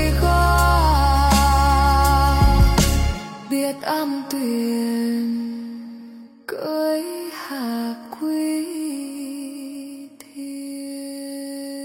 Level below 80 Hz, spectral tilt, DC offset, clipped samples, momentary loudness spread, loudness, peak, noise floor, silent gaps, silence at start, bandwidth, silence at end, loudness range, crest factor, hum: -24 dBFS; -5.5 dB/octave; under 0.1%; under 0.1%; 18 LU; -20 LUFS; -4 dBFS; -41 dBFS; none; 0 s; 16.5 kHz; 0 s; 12 LU; 16 dB; none